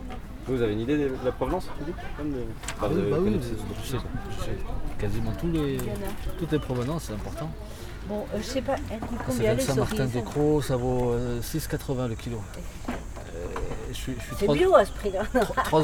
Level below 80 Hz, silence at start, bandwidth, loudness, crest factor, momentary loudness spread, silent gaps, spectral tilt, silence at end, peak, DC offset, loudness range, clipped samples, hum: -38 dBFS; 0 s; 20 kHz; -28 LUFS; 22 dB; 11 LU; none; -6 dB/octave; 0 s; -6 dBFS; under 0.1%; 5 LU; under 0.1%; none